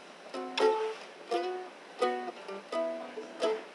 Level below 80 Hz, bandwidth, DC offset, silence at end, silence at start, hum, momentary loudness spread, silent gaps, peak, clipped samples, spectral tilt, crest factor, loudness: under -90 dBFS; 11.5 kHz; under 0.1%; 0 s; 0 s; none; 15 LU; none; -16 dBFS; under 0.1%; -3 dB/octave; 20 dB; -34 LUFS